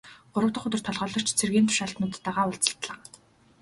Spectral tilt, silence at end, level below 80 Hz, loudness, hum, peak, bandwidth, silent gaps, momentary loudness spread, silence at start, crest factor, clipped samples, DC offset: -3.5 dB/octave; 0.65 s; -62 dBFS; -27 LUFS; none; -2 dBFS; 12 kHz; none; 11 LU; 0.05 s; 26 dB; under 0.1%; under 0.1%